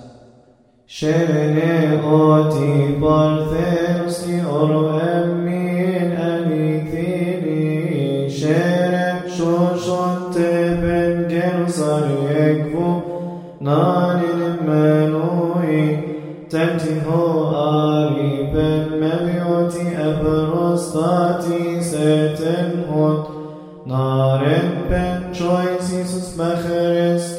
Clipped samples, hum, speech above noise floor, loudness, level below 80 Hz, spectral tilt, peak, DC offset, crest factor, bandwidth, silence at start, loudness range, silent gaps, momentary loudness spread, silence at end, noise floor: under 0.1%; none; 37 dB; -18 LUFS; -42 dBFS; -7.5 dB/octave; -2 dBFS; under 0.1%; 16 dB; 14 kHz; 0 s; 3 LU; none; 6 LU; 0 s; -52 dBFS